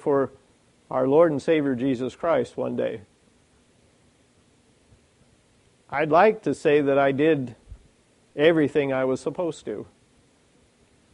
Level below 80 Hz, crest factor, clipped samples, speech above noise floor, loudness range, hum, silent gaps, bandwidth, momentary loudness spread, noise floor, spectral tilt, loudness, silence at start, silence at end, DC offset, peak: -60 dBFS; 20 dB; under 0.1%; 39 dB; 9 LU; none; none; 11 kHz; 13 LU; -61 dBFS; -6.5 dB/octave; -23 LUFS; 0.05 s; 1.3 s; under 0.1%; -6 dBFS